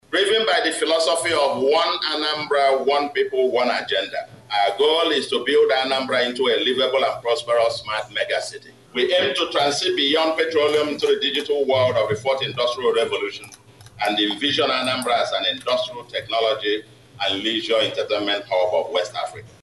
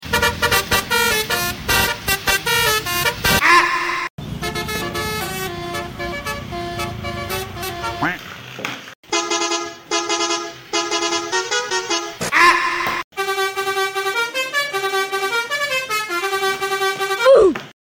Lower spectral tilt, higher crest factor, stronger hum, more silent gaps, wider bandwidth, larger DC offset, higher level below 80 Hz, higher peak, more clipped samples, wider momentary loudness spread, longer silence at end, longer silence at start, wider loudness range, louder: about the same, -3 dB/octave vs -2.5 dB/octave; about the same, 12 dB vs 16 dB; neither; second, none vs 4.10-4.18 s, 8.95-9.03 s, 13.04-13.11 s; second, 12 kHz vs 17 kHz; neither; second, -64 dBFS vs -42 dBFS; second, -8 dBFS vs -2 dBFS; neither; second, 7 LU vs 13 LU; about the same, 0.15 s vs 0.1 s; about the same, 0.1 s vs 0 s; second, 3 LU vs 8 LU; about the same, -20 LUFS vs -19 LUFS